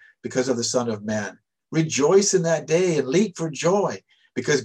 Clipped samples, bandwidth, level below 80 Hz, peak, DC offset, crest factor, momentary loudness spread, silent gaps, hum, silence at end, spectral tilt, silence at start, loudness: under 0.1%; 10.5 kHz; -66 dBFS; -6 dBFS; under 0.1%; 16 dB; 11 LU; none; none; 0 s; -4.5 dB/octave; 0.25 s; -22 LUFS